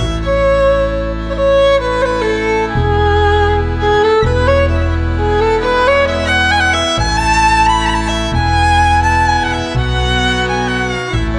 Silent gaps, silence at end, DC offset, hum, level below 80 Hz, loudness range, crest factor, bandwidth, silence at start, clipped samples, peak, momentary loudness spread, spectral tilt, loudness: none; 0 s; under 0.1%; none; -20 dBFS; 1 LU; 12 dB; 10.5 kHz; 0 s; under 0.1%; 0 dBFS; 5 LU; -5 dB/octave; -13 LUFS